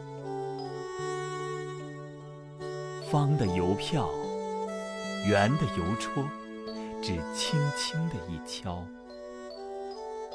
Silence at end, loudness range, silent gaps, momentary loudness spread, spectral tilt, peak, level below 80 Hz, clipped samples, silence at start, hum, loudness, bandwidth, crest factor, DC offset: 0 s; 4 LU; none; 15 LU; -5.5 dB/octave; -12 dBFS; -56 dBFS; under 0.1%; 0 s; none; -32 LUFS; 11 kHz; 20 dB; under 0.1%